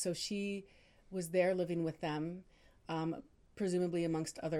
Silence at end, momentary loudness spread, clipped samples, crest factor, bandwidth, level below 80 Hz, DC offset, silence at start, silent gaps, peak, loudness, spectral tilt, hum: 0 s; 12 LU; under 0.1%; 18 dB; 15.5 kHz; -68 dBFS; under 0.1%; 0 s; none; -20 dBFS; -38 LUFS; -5.5 dB/octave; none